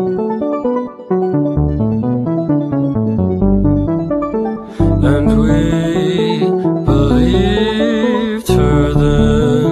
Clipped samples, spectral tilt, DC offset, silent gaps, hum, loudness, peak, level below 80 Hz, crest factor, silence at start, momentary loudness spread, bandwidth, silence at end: under 0.1%; -8 dB/octave; under 0.1%; none; none; -14 LUFS; 0 dBFS; -24 dBFS; 14 dB; 0 s; 6 LU; 13.5 kHz; 0 s